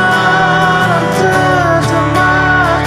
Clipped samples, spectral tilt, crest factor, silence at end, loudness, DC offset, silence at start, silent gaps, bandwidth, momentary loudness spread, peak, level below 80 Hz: under 0.1%; -5.5 dB/octave; 10 dB; 0 s; -10 LUFS; under 0.1%; 0 s; none; 15.5 kHz; 2 LU; 0 dBFS; -32 dBFS